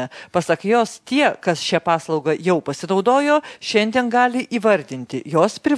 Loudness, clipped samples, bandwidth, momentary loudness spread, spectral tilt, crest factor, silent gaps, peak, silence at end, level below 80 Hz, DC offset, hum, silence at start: -19 LUFS; under 0.1%; 11 kHz; 5 LU; -5 dB/octave; 18 dB; none; -2 dBFS; 0 s; -64 dBFS; under 0.1%; none; 0 s